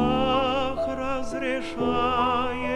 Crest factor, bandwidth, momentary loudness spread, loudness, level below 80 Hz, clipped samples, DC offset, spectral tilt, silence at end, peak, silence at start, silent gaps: 14 dB; 11.5 kHz; 6 LU; -25 LUFS; -42 dBFS; under 0.1%; under 0.1%; -5.5 dB/octave; 0 s; -10 dBFS; 0 s; none